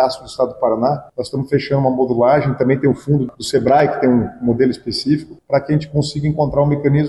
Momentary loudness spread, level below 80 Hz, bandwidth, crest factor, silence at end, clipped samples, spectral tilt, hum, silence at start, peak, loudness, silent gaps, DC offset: 6 LU; -44 dBFS; 12 kHz; 12 dB; 0 s; under 0.1%; -7 dB/octave; none; 0 s; -4 dBFS; -17 LUFS; none; under 0.1%